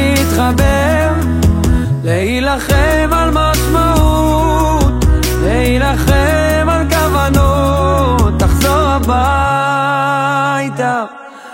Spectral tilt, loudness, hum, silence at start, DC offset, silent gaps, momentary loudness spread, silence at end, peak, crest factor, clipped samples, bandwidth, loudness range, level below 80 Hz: -5.5 dB/octave; -12 LUFS; none; 0 s; under 0.1%; none; 3 LU; 0 s; 0 dBFS; 12 dB; under 0.1%; 16.5 kHz; 1 LU; -18 dBFS